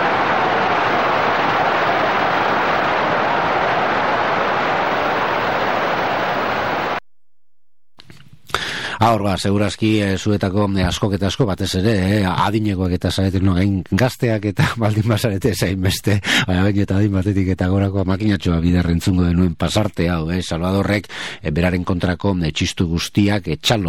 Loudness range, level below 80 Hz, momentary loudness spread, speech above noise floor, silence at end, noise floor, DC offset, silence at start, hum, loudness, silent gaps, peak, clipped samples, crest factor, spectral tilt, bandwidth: 4 LU; -38 dBFS; 3 LU; 67 dB; 0 s; -84 dBFS; 0.9%; 0 s; none; -18 LUFS; none; -2 dBFS; under 0.1%; 16 dB; -5.5 dB/octave; 16.5 kHz